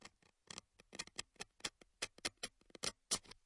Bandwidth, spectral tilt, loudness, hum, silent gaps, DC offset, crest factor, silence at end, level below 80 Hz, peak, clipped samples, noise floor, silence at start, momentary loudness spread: 12 kHz; -0.5 dB/octave; -47 LUFS; none; none; under 0.1%; 30 dB; 0.15 s; -72 dBFS; -20 dBFS; under 0.1%; -65 dBFS; 0 s; 13 LU